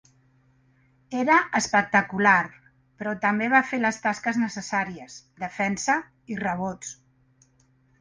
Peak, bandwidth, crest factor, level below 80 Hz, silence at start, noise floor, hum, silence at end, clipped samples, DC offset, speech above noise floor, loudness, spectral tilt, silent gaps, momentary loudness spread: -4 dBFS; 10 kHz; 22 dB; -64 dBFS; 1.1 s; -63 dBFS; none; 1.1 s; under 0.1%; under 0.1%; 38 dB; -24 LUFS; -4 dB/octave; none; 16 LU